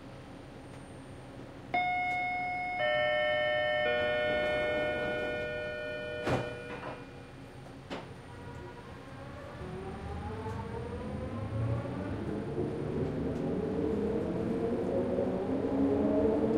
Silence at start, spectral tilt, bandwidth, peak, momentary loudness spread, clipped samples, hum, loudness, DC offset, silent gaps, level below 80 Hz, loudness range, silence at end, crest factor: 0 s; -7 dB/octave; 12 kHz; -18 dBFS; 18 LU; under 0.1%; none; -33 LUFS; under 0.1%; none; -54 dBFS; 12 LU; 0 s; 16 dB